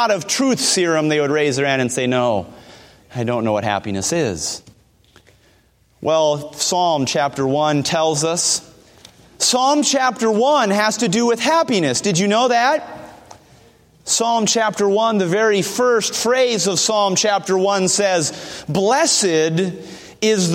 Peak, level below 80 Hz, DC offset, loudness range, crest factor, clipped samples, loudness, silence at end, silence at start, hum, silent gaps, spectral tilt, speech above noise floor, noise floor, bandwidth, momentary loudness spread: -2 dBFS; -58 dBFS; under 0.1%; 5 LU; 16 dB; under 0.1%; -17 LUFS; 0 s; 0 s; none; none; -3 dB/octave; 39 dB; -56 dBFS; 16.5 kHz; 8 LU